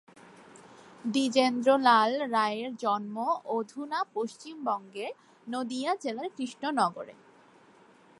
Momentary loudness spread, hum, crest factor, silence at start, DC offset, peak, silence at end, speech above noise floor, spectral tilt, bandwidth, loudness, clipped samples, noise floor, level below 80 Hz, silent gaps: 15 LU; none; 20 dB; 0.4 s; under 0.1%; -10 dBFS; 1.1 s; 29 dB; -4 dB/octave; 11.5 kHz; -29 LUFS; under 0.1%; -58 dBFS; -84 dBFS; none